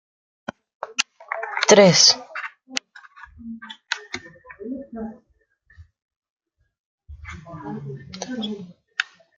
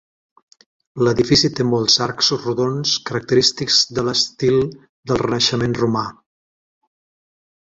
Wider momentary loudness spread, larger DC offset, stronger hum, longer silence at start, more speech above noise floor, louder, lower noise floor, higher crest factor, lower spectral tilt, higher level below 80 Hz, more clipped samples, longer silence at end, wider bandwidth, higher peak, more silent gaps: first, 25 LU vs 8 LU; neither; neither; about the same, 0.85 s vs 0.95 s; second, 43 dB vs over 72 dB; about the same, -19 LUFS vs -17 LUFS; second, -62 dBFS vs under -90 dBFS; first, 24 dB vs 18 dB; second, -2.5 dB/octave vs -4 dB/octave; second, -56 dBFS vs -48 dBFS; neither; second, 0.35 s vs 1.6 s; first, 11 kHz vs 8 kHz; about the same, 0 dBFS vs -2 dBFS; first, 6.02-6.09 s, 6.16-6.22 s, 6.30-6.36 s, 6.79-6.98 s vs 4.89-5.03 s